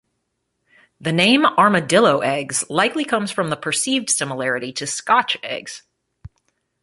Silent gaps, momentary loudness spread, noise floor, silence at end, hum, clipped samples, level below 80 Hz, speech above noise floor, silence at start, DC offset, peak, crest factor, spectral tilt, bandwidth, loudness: none; 11 LU; -74 dBFS; 1.05 s; none; under 0.1%; -60 dBFS; 55 dB; 1 s; under 0.1%; -2 dBFS; 18 dB; -3 dB/octave; 12 kHz; -18 LUFS